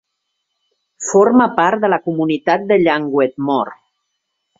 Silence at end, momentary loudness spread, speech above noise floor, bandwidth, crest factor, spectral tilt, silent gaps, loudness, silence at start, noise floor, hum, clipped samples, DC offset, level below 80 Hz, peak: 0.85 s; 7 LU; 59 dB; 7.8 kHz; 16 dB; -5 dB/octave; none; -15 LUFS; 1 s; -73 dBFS; none; under 0.1%; under 0.1%; -60 dBFS; 0 dBFS